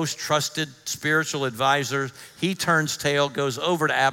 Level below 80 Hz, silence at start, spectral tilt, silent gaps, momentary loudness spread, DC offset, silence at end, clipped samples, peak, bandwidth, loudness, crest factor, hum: -66 dBFS; 0 s; -3.5 dB/octave; none; 7 LU; under 0.1%; 0 s; under 0.1%; -6 dBFS; 17 kHz; -24 LUFS; 18 dB; none